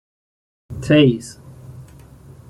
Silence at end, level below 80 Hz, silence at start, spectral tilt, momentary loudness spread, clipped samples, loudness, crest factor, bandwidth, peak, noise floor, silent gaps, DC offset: 0.65 s; -48 dBFS; 0.7 s; -6.5 dB/octave; 26 LU; under 0.1%; -16 LUFS; 18 dB; 12 kHz; -2 dBFS; -43 dBFS; none; under 0.1%